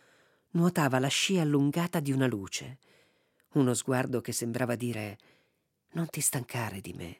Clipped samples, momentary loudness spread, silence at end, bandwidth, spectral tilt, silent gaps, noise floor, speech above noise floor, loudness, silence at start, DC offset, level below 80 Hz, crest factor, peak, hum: under 0.1%; 11 LU; 0.05 s; 16.5 kHz; -4.5 dB/octave; none; -75 dBFS; 45 dB; -30 LUFS; 0.55 s; under 0.1%; -72 dBFS; 20 dB; -10 dBFS; none